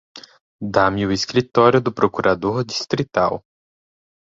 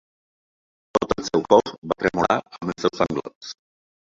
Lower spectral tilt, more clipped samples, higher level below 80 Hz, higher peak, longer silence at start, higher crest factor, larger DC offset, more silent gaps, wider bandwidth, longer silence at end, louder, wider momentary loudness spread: about the same, -5.5 dB/octave vs -5 dB/octave; neither; about the same, -48 dBFS vs -52 dBFS; about the same, -2 dBFS vs -2 dBFS; second, 0.15 s vs 0.95 s; about the same, 18 dB vs 22 dB; neither; first, 0.41-0.59 s vs 1.78-1.82 s, 3.35-3.41 s; about the same, 7.8 kHz vs 7.6 kHz; first, 0.85 s vs 0.65 s; first, -19 LUFS vs -22 LUFS; second, 7 LU vs 19 LU